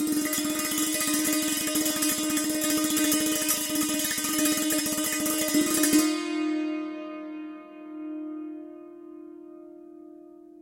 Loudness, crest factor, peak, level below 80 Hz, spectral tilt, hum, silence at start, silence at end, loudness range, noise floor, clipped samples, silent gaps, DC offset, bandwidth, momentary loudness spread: -25 LUFS; 18 dB; -8 dBFS; -62 dBFS; -1.5 dB/octave; none; 0 s; 0 s; 15 LU; -48 dBFS; under 0.1%; none; under 0.1%; 17 kHz; 20 LU